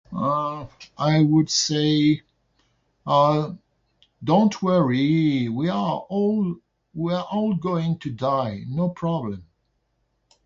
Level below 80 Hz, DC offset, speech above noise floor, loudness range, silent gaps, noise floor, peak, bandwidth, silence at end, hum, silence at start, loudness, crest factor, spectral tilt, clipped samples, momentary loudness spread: -58 dBFS; under 0.1%; 50 dB; 4 LU; none; -71 dBFS; -6 dBFS; 7.6 kHz; 1 s; none; 0.1 s; -22 LUFS; 16 dB; -6 dB/octave; under 0.1%; 14 LU